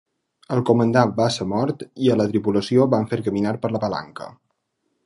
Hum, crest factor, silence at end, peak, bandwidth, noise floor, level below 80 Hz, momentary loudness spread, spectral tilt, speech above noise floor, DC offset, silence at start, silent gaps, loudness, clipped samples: none; 20 dB; 0.75 s; -2 dBFS; 11.5 kHz; -73 dBFS; -56 dBFS; 9 LU; -7 dB/octave; 53 dB; under 0.1%; 0.5 s; none; -21 LUFS; under 0.1%